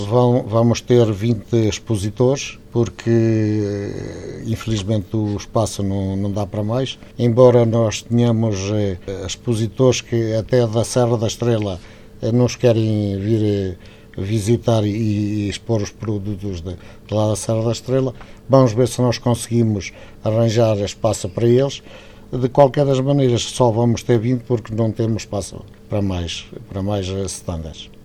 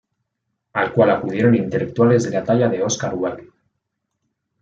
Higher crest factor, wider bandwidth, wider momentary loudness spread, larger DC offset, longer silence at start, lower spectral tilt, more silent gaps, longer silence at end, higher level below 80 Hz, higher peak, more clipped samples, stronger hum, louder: about the same, 18 dB vs 18 dB; first, 13.5 kHz vs 7.8 kHz; first, 12 LU vs 9 LU; neither; second, 0 s vs 0.75 s; about the same, -6.5 dB/octave vs -6 dB/octave; neither; second, 0.1 s vs 1.2 s; first, -44 dBFS vs -58 dBFS; about the same, 0 dBFS vs -2 dBFS; neither; neither; about the same, -19 LUFS vs -18 LUFS